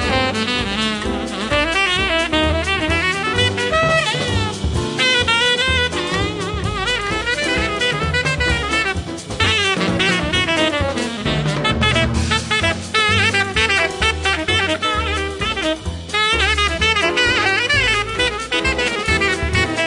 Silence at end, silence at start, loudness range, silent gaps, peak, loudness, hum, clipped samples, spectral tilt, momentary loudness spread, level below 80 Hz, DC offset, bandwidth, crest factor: 0 s; 0 s; 2 LU; none; -2 dBFS; -17 LUFS; none; under 0.1%; -3.5 dB/octave; 6 LU; -32 dBFS; under 0.1%; 11.5 kHz; 16 dB